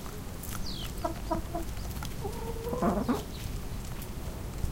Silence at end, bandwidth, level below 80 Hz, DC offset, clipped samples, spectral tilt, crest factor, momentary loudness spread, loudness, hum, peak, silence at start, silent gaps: 0 s; 17 kHz; -40 dBFS; under 0.1%; under 0.1%; -5.5 dB/octave; 18 dB; 9 LU; -36 LUFS; none; -16 dBFS; 0 s; none